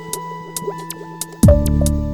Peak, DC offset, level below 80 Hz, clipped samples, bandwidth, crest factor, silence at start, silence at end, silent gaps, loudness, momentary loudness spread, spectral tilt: 0 dBFS; under 0.1%; -22 dBFS; under 0.1%; 18.5 kHz; 16 dB; 0 s; 0 s; none; -18 LUFS; 16 LU; -6.5 dB/octave